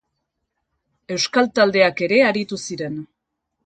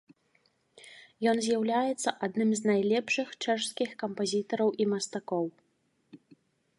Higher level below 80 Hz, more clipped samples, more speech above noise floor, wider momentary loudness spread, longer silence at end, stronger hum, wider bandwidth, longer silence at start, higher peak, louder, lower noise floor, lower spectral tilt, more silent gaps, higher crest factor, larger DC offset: first, -62 dBFS vs -80 dBFS; neither; first, 60 dB vs 41 dB; first, 13 LU vs 7 LU; about the same, 0.6 s vs 0.65 s; neither; second, 9.2 kHz vs 11.5 kHz; first, 1.1 s vs 0.85 s; first, -2 dBFS vs -12 dBFS; first, -18 LUFS vs -30 LUFS; first, -78 dBFS vs -71 dBFS; about the same, -4 dB/octave vs -4 dB/octave; neither; about the same, 20 dB vs 20 dB; neither